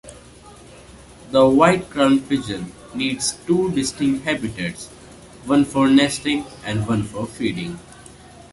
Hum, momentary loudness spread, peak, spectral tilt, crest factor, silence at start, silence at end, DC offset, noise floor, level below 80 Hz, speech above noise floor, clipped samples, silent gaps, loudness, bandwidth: none; 15 LU; -2 dBFS; -5 dB/octave; 18 dB; 0.05 s; 0.6 s; under 0.1%; -44 dBFS; -48 dBFS; 25 dB; under 0.1%; none; -20 LUFS; 11.5 kHz